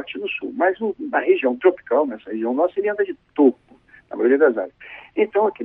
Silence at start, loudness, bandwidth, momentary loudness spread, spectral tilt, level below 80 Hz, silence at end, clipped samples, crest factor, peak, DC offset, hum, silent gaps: 0 s; -20 LUFS; 3.8 kHz; 10 LU; -8.5 dB/octave; -66 dBFS; 0 s; under 0.1%; 18 dB; -2 dBFS; under 0.1%; none; none